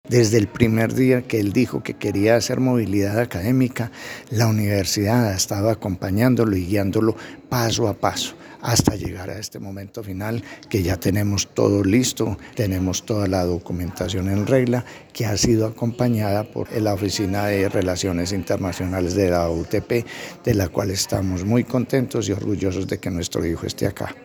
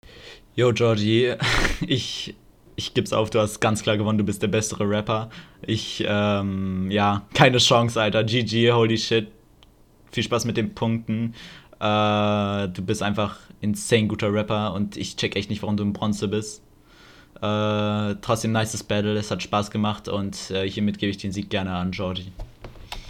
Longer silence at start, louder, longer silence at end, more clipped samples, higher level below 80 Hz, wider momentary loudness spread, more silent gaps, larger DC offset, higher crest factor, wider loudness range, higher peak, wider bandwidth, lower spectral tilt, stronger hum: about the same, 0.05 s vs 0.1 s; about the same, -21 LUFS vs -23 LUFS; about the same, 0 s vs 0 s; neither; about the same, -48 dBFS vs -44 dBFS; about the same, 9 LU vs 11 LU; neither; neither; about the same, 20 dB vs 24 dB; second, 3 LU vs 6 LU; about the same, 0 dBFS vs 0 dBFS; first, over 20 kHz vs 15 kHz; about the same, -5.5 dB/octave vs -5 dB/octave; neither